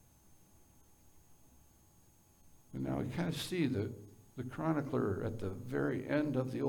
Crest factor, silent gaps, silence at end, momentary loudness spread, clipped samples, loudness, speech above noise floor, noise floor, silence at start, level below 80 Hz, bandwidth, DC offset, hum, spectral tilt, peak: 18 dB; none; 0 s; 11 LU; under 0.1%; -37 LUFS; 29 dB; -65 dBFS; 0.3 s; -64 dBFS; 19 kHz; under 0.1%; none; -6.5 dB/octave; -20 dBFS